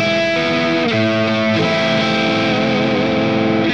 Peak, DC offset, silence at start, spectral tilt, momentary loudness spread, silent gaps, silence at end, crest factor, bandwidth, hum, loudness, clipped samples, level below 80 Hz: -4 dBFS; 0.4%; 0 s; -5.5 dB/octave; 1 LU; none; 0 s; 12 dB; 8.6 kHz; none; -15 LUFS; under 0.1%; -52 dBFS